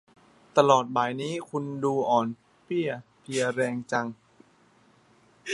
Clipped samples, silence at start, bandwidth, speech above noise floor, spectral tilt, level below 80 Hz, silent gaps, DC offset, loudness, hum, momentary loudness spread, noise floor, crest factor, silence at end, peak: under 0.1%; 0.55 s; 11.5 kHz; 35 dB; -5 dB/octave; -74 dBFS; none; under 0.1%; -27 LUFS; none; 13 LU; -61 dBFS; 24 dB; 0 s; -4 dBFS